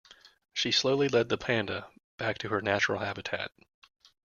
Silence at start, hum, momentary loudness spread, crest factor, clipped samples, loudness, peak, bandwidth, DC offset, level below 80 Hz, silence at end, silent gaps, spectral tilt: 0.55 s; none; 11 LU; 22 dB; under 0.1%; -29 LUFS; -10 dBFS; 7.2 kHz; under 0.1%; -66 dBFS; 0.8 s; 2.04-2.18 s; -4 dB/octave